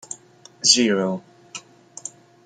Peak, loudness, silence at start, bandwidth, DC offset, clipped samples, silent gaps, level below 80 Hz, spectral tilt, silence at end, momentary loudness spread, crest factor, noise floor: -2 dBFS; -18 LUFS; 0.1 s; 10 kHz; under 0.1%; under 0.1%; none; -70 dBFS; -2 dB/octave; 0.35 s; 23 LU; 24 dB; -49 dBFS